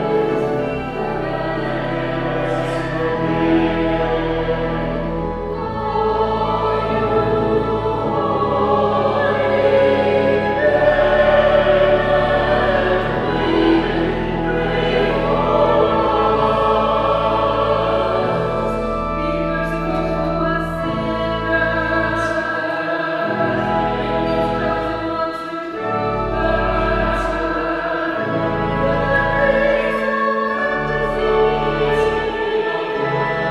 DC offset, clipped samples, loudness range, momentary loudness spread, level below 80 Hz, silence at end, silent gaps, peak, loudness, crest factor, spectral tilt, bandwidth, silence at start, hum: under 0.1%; under 0.1%; 5 LU; 7 LU; -32 dBFS; 0 s; none; -2 dBFS; -18 LUFS; 14 dB; -7 dB/octave; 11.5 kHz; 0 s; none